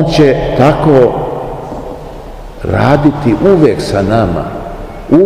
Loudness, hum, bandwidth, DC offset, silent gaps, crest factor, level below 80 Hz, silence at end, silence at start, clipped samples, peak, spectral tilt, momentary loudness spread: -10 LUFS; none; 14.5 kHz; 0.3%; none; 10 dB; -28 dBFS; 0 s; 0 s; 2%; 0 dBFS; -7.5 dB/octave; 18 LU